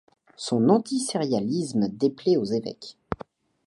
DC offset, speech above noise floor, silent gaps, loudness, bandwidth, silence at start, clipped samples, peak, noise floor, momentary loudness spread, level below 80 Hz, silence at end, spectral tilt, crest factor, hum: under 0.1%; 23 dB; none; -25 LUFS; 11.5 kHz; 0.4 s; under 0.1%; -6 dBFS; -47 dBFS; 15 LU; -56 dBFS; 0.5 s; -6 dB/octave; 20 dB; none